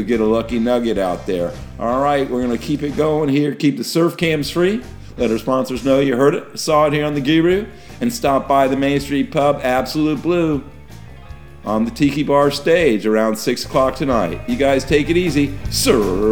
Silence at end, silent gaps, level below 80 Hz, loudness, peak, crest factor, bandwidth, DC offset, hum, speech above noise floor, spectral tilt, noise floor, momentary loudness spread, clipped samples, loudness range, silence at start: 0 s; none; -38 dBFS; -17 LUFS; -2 dBFS; 16 dB; over 20 kHz; 0.8%; none; 21 dB; -5.5 dB/octave; -37 dBFS; 7 LU; under 0.1%; 2 LU; 0 s